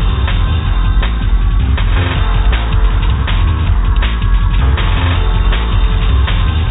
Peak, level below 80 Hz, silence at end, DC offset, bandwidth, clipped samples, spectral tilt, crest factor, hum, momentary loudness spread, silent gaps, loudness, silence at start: -2 dBFS; -12 dBFS; 0 s; under 0.1%; 4 kHz; under 0.1%; -9.5 dB/octave; 10 dB; none; 2 LU; none; -14 LUFS; 0 s